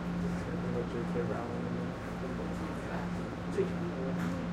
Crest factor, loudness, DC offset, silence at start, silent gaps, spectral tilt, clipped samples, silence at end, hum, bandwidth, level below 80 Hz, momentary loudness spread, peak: 16 dB; -36 LUFS; under 0.1%; 0 s; none; -7.5 dB/octave; under 0.1%; 0 s; none; 11 kHz; -50 dBFS; 3 LU; -20 dBFS